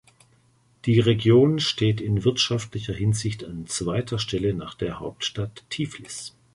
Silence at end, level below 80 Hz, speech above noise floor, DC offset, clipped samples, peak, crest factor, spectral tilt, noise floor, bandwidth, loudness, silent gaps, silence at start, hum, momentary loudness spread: 0.25 s; -48 dBFS; 38 dB; under 0.1%; under 0.1%; -6 dBFS; 18 dB; -5.5 dB/octave; -61 dBFS; 11.5 kHz; -24 LUFS; none; 0.85 s; none; 14 LU